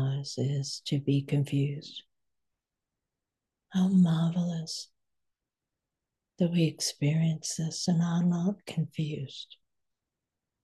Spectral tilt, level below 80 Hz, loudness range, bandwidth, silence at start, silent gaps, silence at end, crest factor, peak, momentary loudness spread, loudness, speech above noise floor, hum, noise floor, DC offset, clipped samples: -6 dB/octave; -74 dBFS; 3 LU; 12.5 kHz; 0 s; none; 1.1 s; 16 dB; -14 dBFS; 13 LU; -29 LUFS; 60 dB; none; -89 dBFS; under 0.1%; under 0.1%